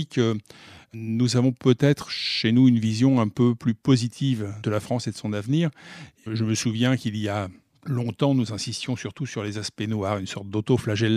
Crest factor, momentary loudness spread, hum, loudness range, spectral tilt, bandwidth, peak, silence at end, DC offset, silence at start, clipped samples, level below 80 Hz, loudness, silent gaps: 18 dB; 10 LU; none; 6 LU; -6 dB/octave; 13.5 kHz; -6 dBFS; 0 s; under 0.1%; 0 s; under 0.1%; -62 dBFS; -24 LUFS; none